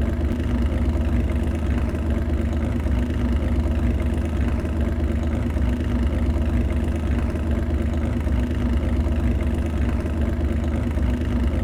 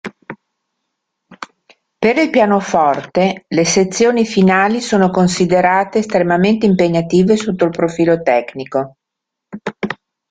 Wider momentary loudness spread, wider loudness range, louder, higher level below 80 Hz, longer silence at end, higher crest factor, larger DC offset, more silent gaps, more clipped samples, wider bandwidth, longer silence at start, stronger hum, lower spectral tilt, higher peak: second, 2 LU vs 16 LU; second, 0 LU vs 4 LU; second, -23 LUFS vs -14 LUFS; first, -24 dBFS vs -52 dBFS; second, 0 s vs 0.35 s; about the same, 10 dB vs 14 dB; neither; neither; neither; first, 11 kHz vs 9.4 kHz; about the same, 0 s vs 0.05 s; neither; first, -8.5 dB/octave vs -5.5 dB/octave; second, -10 dBFS vs 0 dBFS